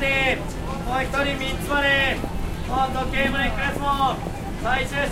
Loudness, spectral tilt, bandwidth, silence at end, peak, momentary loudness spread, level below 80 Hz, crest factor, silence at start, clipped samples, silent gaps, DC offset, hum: -23 LUFS; -4.5 dB/octave; 16 kHz; 0 s; -6 dBFS; 10 LU; -32 dBFS; 16 dB; 0 s; under 0.1%; none; under 0.1%; none